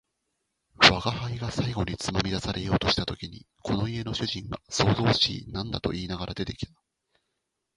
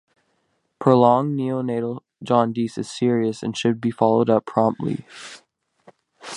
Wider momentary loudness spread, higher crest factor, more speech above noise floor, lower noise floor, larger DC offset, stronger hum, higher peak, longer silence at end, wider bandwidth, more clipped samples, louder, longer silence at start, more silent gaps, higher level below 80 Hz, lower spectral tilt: about the same, 16 LU vs 16 LU; first, 26 dB vs 20 dB; about the same, 52 dB vs 49 dB; first, -81 dBFS vs -70 dBFS; neither; neither; about the same, -2 dBFS vs -2 dBFS; first, 1.1 s vs 0 s; about the same, 11.5 kHz vs 11 kHz; neither; second, -26 LUFS vs -21 LUFS; about the same, 0.8 s vs 0.8 s; neither; first, -46 dBFS vs -64 dBFS; second, -4.5 dB/octave vs -7 dB/octave